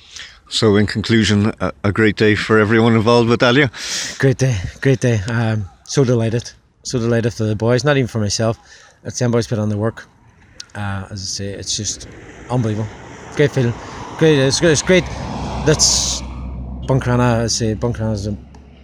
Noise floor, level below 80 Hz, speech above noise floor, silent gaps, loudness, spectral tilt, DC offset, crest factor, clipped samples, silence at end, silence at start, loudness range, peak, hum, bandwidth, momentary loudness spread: -41 dBFS; -36 dBFS; 24 dB; none; -17 LUFS; -4.5 dB/octave; under 0.1%; 16 dB; under 0.1%; 0.25 s; 0.1 s; 8 LU; 0 dBFS; none; 13.5 kHz; 16 LU